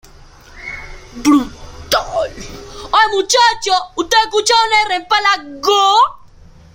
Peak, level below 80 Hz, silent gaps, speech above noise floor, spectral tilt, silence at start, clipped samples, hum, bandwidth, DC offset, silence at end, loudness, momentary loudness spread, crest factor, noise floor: 0 dBFS; -40 dBFS; none; 28 dB; -1.5 dB/octave; 0.55 s; under 0.1%; none; 16.5 kHz; under 0.1%; 0.55 s; -13 LUFS; 18 LU; 14 dB; -41 dBFS